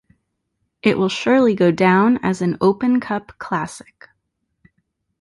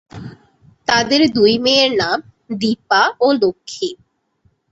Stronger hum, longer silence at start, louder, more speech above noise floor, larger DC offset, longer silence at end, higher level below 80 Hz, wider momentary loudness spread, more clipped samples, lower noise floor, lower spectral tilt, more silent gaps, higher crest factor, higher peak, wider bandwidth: neither; first, 0.85 s vs 0.15 s; second, -18 LUFS vs -15 LUFS; first, 56 dB vs 46 dB; neither; first, 1.45 s vs 0.75 s; about the same, -56 dBFS vs -54 dBFS; second, 12 LU vs 15 LU; neither; first, -73 dBFS vs -61 dBFS; first, -6.5 dB/octave vs -3.5 dB/octave; neither; about the same, 16 dB vs 16 dB; about the same, -2 dBFS vs 0 dBFS; first, 11.5 kHz vs 8 kHz